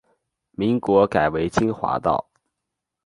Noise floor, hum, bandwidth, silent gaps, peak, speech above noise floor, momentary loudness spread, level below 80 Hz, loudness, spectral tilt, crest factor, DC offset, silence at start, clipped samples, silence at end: -82 dBFS; none; 11.5 kHz; none; -4 dBFS; 62 dB; 8 LU; -48 dBFS; -21 LUFS; -7 dB/octave; 20 dB; under 0.1%; 0.6 s; under 0.1%; 0.85 s